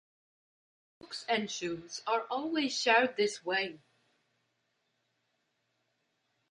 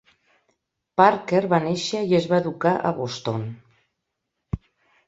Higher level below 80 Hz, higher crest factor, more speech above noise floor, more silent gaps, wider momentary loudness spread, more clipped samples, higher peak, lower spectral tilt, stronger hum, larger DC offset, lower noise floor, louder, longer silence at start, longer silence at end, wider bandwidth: second, -80 dBFS vs -50 dBFS; about the same, 24 dB vs 22 dB; second, 47 dB vs 58 dB; neither; second, 13 LU vs 16 LU; neither; second, -12 dBFS vs -2 dBFS; second, -2.5 dB/octave vs -6 dB/octave; neither; neither; about the same, -79 dBFS vs -80 dBFS; second, -31 LUFS vs -22 LUFS; about the same, 1.05 s vs 1 s; first, 2.75 s vs 0.5 s; first, 11 kHz vs 8 kHz